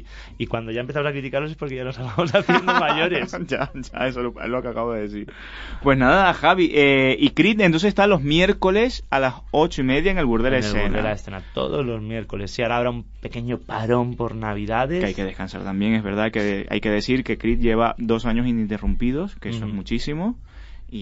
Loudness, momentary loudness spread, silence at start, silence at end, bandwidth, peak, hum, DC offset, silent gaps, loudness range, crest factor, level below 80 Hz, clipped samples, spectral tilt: -21 LUFS; 12 LU; 0 s; 0 s; 8 kHz; -2 dBFS; none; under 0.1%; none; 8 LU; 18 dB; -34 dBFS; under 0.1%; -6.5 dB/octave